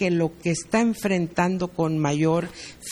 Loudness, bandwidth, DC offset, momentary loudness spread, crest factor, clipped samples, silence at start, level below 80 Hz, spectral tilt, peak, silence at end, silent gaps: -24 LUFS; 15 kHz; under 0.1%; 5 LU; 18 dB; under 0.1%; 0 s; -54 dBFS; -6 dB/octave; -6 dBFS; 0 s; none